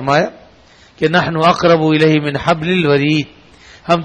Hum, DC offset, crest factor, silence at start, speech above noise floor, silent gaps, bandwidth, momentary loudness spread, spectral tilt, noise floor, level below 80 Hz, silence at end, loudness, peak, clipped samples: none; under 0.1%; 14 dB; 0 s; 33 dB; none; 9.8 kHz; 8 LU; -6.5 dB/octave; -45 dBFS; -46 dBFS; 0 s; -14 LUFS; 0 dBFS; under 0.1%